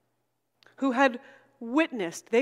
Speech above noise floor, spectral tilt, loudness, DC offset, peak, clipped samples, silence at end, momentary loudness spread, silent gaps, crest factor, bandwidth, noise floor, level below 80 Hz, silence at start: 51 dB; -4 dB/octave; -27 LUFS; under 0.1%; -8 dBFS; under 0.1%; 0 s; 15 LU; none; 20 dB; 14 kHz; -78 dBFS; -86 dBFS; 0.8 s